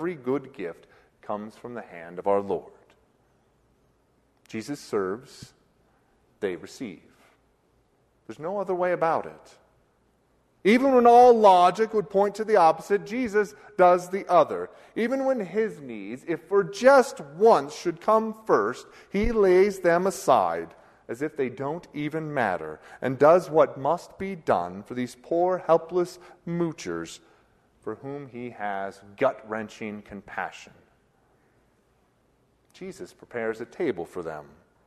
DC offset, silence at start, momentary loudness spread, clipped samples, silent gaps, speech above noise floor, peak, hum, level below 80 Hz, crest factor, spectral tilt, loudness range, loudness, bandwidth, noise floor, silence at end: under 0.1%; 0 s; 19 LU; under 0.1%; none; 42 dB; -6 dBFS; none; -52 dBFS; 20 dB; -5.5 dB/octave; 17 LU; -24 LUFS; 13.5 kHz; -66 dBFS; 0.45 s